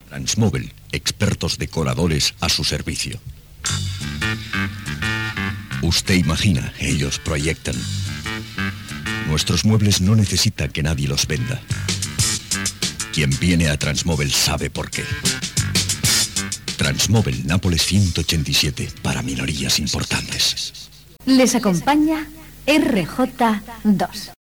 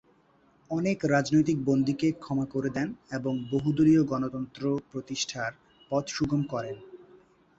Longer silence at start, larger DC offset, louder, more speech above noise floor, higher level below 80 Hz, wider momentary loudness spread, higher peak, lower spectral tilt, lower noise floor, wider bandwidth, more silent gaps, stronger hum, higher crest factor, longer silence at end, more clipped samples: second, 0.05 s vs 0.7 s; first, 0.1% vs under 0.1%; first, -20 LUFS vs -28 LUFS; second, 22 dB vs 36 dB; first, -38 dBFS vs -58 dBFS; about the same, 9 LU vs 11 LU; first, -4 dBFS vs -10 dBFS; second, -4 dB/octave vs -6 dB/octave; second, -41 dBFS vs -63 dBFS; first, over 20 kHz vs 8 kHz; neither; neither; about the same, 16 dB vs 18 dB; second, 0.1 s vs 0.55 s; neither